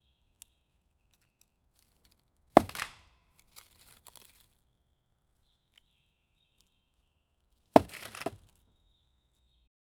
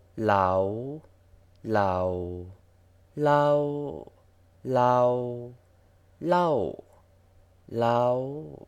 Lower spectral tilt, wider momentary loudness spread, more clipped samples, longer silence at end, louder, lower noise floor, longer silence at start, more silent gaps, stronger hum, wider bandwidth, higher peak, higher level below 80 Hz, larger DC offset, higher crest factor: second, -5.5 dB/octave vs -7.5 dB/octave; second, 16 LU vs 19 LU; neither; first, 1.7 s vs 0.1 s; second, -29 LUFS vs -26 LUFS; first, -75 dBFS vs -59 dBFS; first, 2.55 s vs 0.15 s; neither; neither; first, over 20 kHz vs 10.5 kHz; first, 0 dBFS vs -8 dBFS; about the same, -62 dBFS vs -60 dBFS; neither; first, 36 dB vs 20 dB